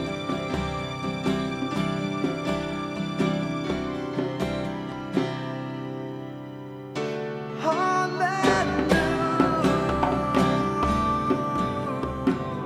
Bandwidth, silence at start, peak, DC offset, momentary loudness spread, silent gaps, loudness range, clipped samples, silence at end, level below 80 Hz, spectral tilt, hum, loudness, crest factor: 15 kHz; 0 s; -6 dBFS; under 0.1%; 10 LU; none; 8 LU; under 0.1%; 0 s; -44 dBFS; -6 dB/octave; none; -26 LUFS; 20 dB